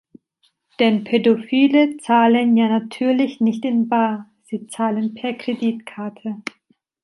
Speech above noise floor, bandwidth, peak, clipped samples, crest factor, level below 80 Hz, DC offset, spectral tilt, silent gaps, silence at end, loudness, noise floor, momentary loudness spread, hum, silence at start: 47 dB; 11.5 kHz; -2 dBFS; under 0.1%; 16 dB; -70 dBFS; under 0.1%; -6 dB/octave; none; 0.6 s; -19 LUFS; -65 dBFS; 15 LU; none; 0.8 s